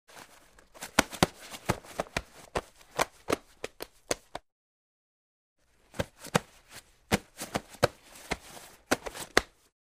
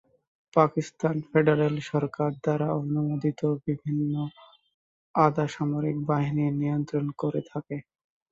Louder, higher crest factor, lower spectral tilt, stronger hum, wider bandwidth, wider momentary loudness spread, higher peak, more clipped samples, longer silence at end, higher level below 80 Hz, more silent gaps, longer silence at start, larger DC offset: second, -33 LUFS vs -27 LUFS; first, 34 dB vs 22 dB; second, -3.5 dB/octave vs -8.5 dB/octave; neither; first, 15.5 kHz vs 7.8 kHz; first, 21 LU vs 8 LU; first, 0 dBFS vs -4 dBFS; neither; about the same, 0.45 s vs 0.5 s; first, -54 dBFS vs -64 dBFS; first, 4.52-5.56 s vs 4.74-5.14 s; second, 0.15 s vs 0.55 s; neither